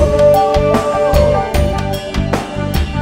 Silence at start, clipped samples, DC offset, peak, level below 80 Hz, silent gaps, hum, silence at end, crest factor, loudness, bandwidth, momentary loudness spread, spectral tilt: 0 s; under 0.1%; under 0.1%; 0 dBFS; -20 dBFS; none; none; 0 s; 12 dB; -14 LUFS; 16.5 kHz; 9 LU; -6.5 dB/octave